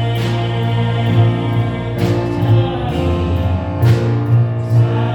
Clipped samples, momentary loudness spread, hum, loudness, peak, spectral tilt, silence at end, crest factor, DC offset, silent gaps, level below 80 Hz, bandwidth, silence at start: under 0.1%; 4 LU; none; -16 LUFS; -2 dBFS; -8 dB/octave; 0 s; 12 dB; under 0.1%; none; -34 dBFS; 8 kHz; 0 s